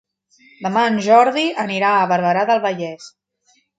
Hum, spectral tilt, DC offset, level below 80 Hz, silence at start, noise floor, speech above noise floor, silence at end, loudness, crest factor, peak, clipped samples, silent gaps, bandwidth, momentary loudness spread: none; -5 dB/octave; under 0.1%; -70 dBFS; 0.6 s; -61 dBFS; 44 dB; 0.7 s; -17 LUFS; 18 dB; 0 dBFS; under 0.1%; none; 9.2 kHz; 14 LU